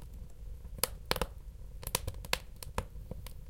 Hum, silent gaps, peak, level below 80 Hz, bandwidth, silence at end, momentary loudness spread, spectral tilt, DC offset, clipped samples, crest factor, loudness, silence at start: none; none; -8 dBFS; -46 dBFS; 17 kHz; 0 s; 14 LU; -2.5 dB/octave; under 0.1%; under 0.1%; 32 dB; -38 LUFS; 0 s